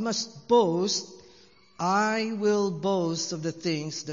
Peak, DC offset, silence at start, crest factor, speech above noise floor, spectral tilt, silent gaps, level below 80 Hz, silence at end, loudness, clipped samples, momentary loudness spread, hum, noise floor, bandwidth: -10 dBFS; under 0.1%; 0 s; 18 dB; 30 dB; -4 dB/octave; none; -72 dBFS; 0 s; -27 LUFS; under 0.1%; 8 LU; none; -57 dBFS; 7.6 kHz